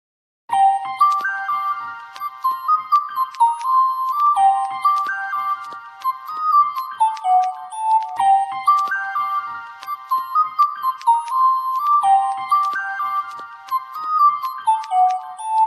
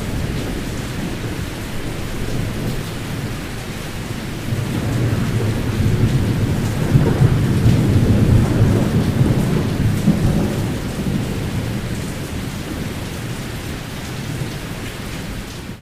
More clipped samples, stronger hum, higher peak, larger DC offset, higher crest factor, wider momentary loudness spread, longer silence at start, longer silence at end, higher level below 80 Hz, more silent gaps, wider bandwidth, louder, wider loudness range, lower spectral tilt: neither; neither; second, -6 dBFS vs 0 dBFS; neither; about the same, 14 dB vs 18 dB; about the same, 10 LU vs 12 LU; first, 0.5 s vs 0 s; about the same, 0 s vs 0 s; second, -80 dBFS vs -30 dBFS; neither; second, 13.5 kHz vs 16 kHz; about the same, -19 LUFS vs -20 LUFS; second, 2 LU vs 10 LU; second, -0.5 dB/octave vs -6.5 dB/octave